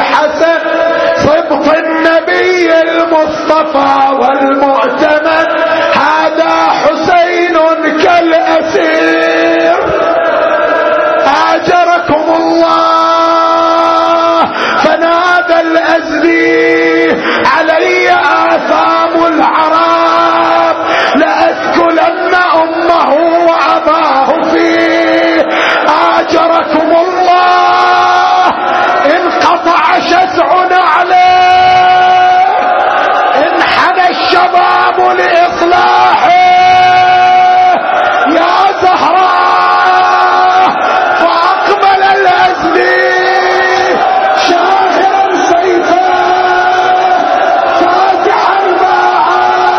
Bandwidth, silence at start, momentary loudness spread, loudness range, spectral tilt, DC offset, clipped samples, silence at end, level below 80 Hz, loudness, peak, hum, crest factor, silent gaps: 6.8 kHz; 0 s; 3 LU; 2 LU; -4 dB/octave; under 0.1%; 0.5%; 0 s; -46 dBFS; -7 LUFS; 0 dBFS; none; 8 dB; none